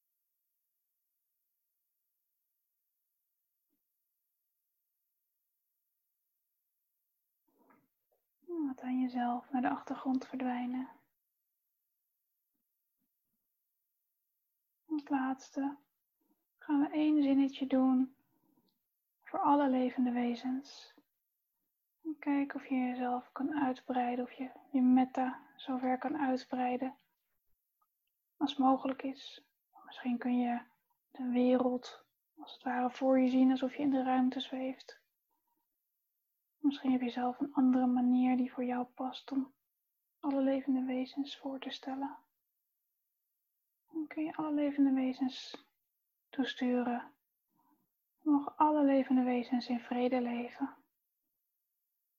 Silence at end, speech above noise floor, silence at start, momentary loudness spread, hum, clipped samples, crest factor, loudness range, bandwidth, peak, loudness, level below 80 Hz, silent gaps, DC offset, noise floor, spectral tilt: 1.45 s; 51 dB; 8.5 s; 13 LU; none; under 0.1%; 20 dB; 9 LU; 6.8 kHz; -16 dBFS; -34 LUFS; -82 dBFS; none; under 0.1%; -84 dBFS; -5.5 dB/octave